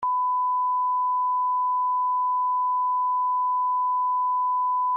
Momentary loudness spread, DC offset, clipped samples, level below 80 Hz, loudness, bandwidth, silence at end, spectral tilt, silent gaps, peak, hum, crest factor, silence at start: 0 LU; under 0.1%; under 0.1%; -82 dBFS; -24 LUFS; 1.5 kHz; 0 s; 3.5 dB/octave; none; -20 dBFS; 50 Hz at -110 dBFS; 4 dB; 0 s